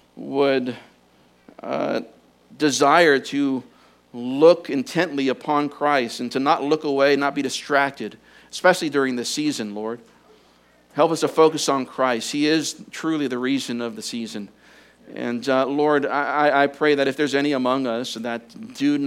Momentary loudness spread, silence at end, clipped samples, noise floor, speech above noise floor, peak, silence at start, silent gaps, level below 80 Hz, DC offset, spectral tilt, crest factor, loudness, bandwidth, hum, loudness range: 14 LU; 0 s; under 0.1%; -56 dBFS; 36 dB; -2 dBFS; 0.15 s; none; -70 dBFS; under 0.1%; -4 dB/octave; 20 dB; -21 LUFS; 16 kHz; none; 4 LU